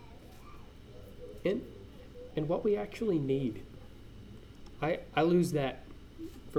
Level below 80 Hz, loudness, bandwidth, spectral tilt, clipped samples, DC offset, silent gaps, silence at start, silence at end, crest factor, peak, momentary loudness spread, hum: -54 dBFS; -33 LUFS; 16 kHz; -7 dB/octave; under 0.1%; under 0.1%; none; 0 s; 0 s; 18 dB; -16 dBFS; 24 LU; none